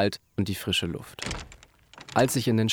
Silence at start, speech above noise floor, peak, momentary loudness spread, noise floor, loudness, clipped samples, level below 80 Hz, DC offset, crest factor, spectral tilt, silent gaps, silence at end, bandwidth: 0 s; 24 dB; -8 dBFS; 14 LU; -51 dBFS; -28 LUFS; under 0.1%; -50 dBFS; under 0.1%; 20 dB; -4.5 dB/octave; none; 0 s; 19 kHz